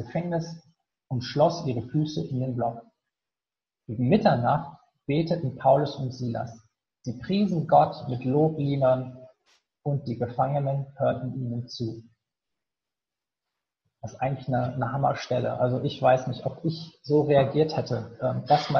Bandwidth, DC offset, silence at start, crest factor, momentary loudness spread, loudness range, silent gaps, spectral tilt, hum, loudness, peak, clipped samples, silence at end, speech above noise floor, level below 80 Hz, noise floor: 6.8 kHz; under 0.1%; 0 s; 20 dB; 14 LU; 7 LU; none; -8 dB/octave; none; -26 LUFS; -6 dBFS; under 0.1%; 0 s; over 65 dB; -60 dBFS; under -90 dBFS